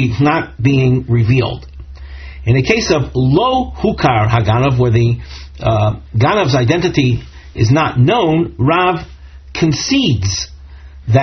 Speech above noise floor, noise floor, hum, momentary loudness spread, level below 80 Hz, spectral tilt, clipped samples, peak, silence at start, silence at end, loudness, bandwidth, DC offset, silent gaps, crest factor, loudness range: 22 dB; -34 dBFS; none; 15 LU; -32 dBFS; -5.5 dB/octave; under 0.1%; 0 dBFS; 0 s; 0 s; -14 LUFS; 6.4 kHz; under 0.1%; none; 14 dB; 1 LU